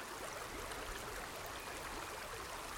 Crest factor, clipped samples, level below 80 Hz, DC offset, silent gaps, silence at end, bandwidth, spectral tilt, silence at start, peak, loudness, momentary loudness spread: 16 dB; under 0.1%; -58 dBFS; under 0.1%; none; 0 s; 17.5 kHz; -2.5 dB/octave; 0 s; -32 dBFS; -45 LUFS; 1 LU